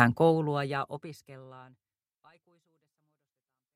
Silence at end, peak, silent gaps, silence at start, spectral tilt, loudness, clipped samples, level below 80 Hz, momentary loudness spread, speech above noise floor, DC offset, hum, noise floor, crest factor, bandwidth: 2.15 s; -4 dBFS; none; 0 s; -7.5 dB/octave; -28 LUFS; under 0.1%; -72 dBFS; 25 LU; 60 dB; under 0.1%; none; -90 dBFS; 28 dB; 16 kHz